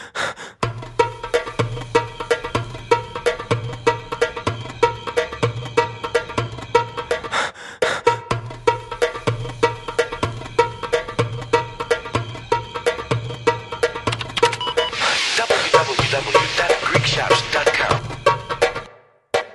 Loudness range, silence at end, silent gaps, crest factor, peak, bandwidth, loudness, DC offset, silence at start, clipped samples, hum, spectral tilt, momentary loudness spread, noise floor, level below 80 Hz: 5 LU; 0 s; none; 22 dB; 0 dBFS; 11.5 kHz; -21 LUFS; under 0.1%; 0 s; under 0.1%; none; -4 dB/octave; 8 LU; -47 dBFS; -44 dBFS